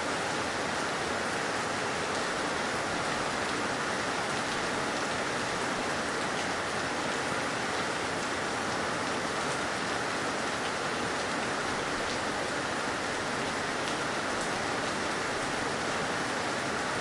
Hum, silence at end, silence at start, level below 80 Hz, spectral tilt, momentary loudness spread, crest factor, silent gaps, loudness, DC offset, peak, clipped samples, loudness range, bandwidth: none; 0 s; 0 s; -58 dBFS; -3 dB/octave; 1 LU; 14 dB; none; -31 LUFS; under 0.1%; -16 dBFS; under 0.1%; 1 LU; 11.5 kHz